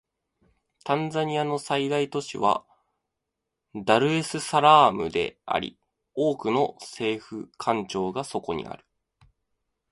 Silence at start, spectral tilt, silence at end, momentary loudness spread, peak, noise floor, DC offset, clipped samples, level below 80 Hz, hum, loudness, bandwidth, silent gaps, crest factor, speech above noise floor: 0.85 s; -5 dB/octave; 1.15 s; 14 LU; -2 dBFS; -84 dBFS; under 0.1%; under 0.1%; -62 dBFS; none; -25 LUFS; 11.5 kHz; none; 24 dB; 59 dB